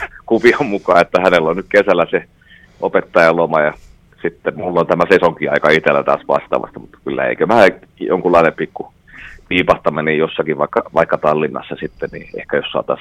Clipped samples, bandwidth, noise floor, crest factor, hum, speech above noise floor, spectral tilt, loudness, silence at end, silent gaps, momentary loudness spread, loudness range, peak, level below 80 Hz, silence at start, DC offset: 0.1%; 12.5 kHz; -37 dBFS; 16 dB; none; 23 dB; -6 dB/octave; -15 LUFS; 0 s; none; 13 LU; 3 LU; 0 dBFS; -48 dBFS; 0 s; under 0.1%